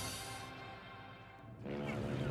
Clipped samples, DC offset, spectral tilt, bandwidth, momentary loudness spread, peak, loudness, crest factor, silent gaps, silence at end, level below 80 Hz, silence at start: under 0.1%; under 0.1%; -5 dB/octave; 14.5 kHz; 13 LU; -28 dBFS; -45 LUFS; 16 dB; none; 0 s; -62 dBFS; 0 s